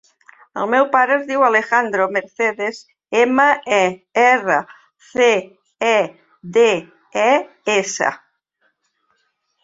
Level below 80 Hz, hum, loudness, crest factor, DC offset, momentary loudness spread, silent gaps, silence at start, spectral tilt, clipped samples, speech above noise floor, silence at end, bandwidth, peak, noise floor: -66 dBFS; none; -17 LUFS; 16 dB; under 0.1%; 11 LU; none; 0.55 s; -3 dB/octave; under 0.1%; 51 dB; 1.45 s; 7.8 kHz; -2 dBFS; -67 dBFS